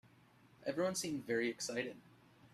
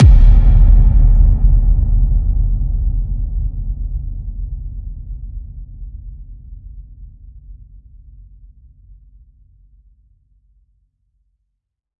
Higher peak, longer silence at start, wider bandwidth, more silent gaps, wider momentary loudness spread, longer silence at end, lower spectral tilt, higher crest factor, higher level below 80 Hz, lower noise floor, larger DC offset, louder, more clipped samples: second, -24 dBFS vs 0 dBFS; first, 0.6 s vs 0 s; first, 15.5 kHz vs 2.4 kHz; neither; second, 9 LU vs 25 LU; second, 0.05 s vs 4.45 s; second, -3.5 dB/octave vs -10 dB/octave; about the same, 18 dB vs 14 dB; second, -78 dBFS vs -16 dBFS; second, -66 dBFS vs -74 dBFS; neither; second, -40 LUFS vs -16 LUFS; neither